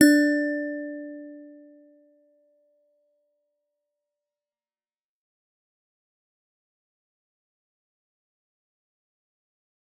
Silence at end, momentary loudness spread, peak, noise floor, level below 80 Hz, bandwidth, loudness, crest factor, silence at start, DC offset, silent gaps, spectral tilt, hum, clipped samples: 8.5 s; 25 LU; -4 dBFS; under -90 dBFS; -84 dBFS; 13 kHz; -24 LUFS; 28 dB; 0 s; under 0.1%; none; -3 dB/octave; none; under 0.1%